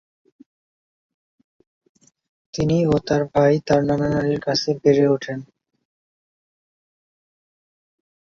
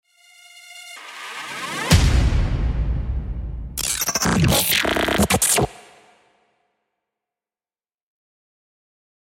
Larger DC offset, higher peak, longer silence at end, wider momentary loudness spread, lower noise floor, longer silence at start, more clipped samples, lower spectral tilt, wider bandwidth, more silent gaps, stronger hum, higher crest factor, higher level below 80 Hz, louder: neither; about the same, -2 dBFS vs -2 dBFS; second, 2.9 s vs 3.6 s; second, 8 LU vs 18 LU; about the same, under -90 dBFS vs under -90 dBFS; first, 2.55 s vs 0.55 s; neither; first, -6.5 dB/octave vs -3.5 dB/octave; second, 7.4 kHz vs 16.5 kHz; neither; neither; about the same, 20 dB vs 20 dB; second, -52 dBFS vs -28 dBFS; about the same, -19 LUFS vs -20 LUFS